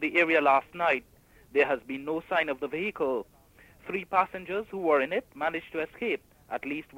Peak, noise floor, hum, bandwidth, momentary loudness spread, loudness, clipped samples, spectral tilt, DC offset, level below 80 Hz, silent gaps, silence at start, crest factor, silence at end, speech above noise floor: -10 dBFS; -57 dBFS; none; 16 kHz; 12 LU; -29 LUFS; under 0.1%; -5.5 dB/octave; under 0.1%; -64 dBFS; none; 0 s; 18 dB; 0 s; 29 dB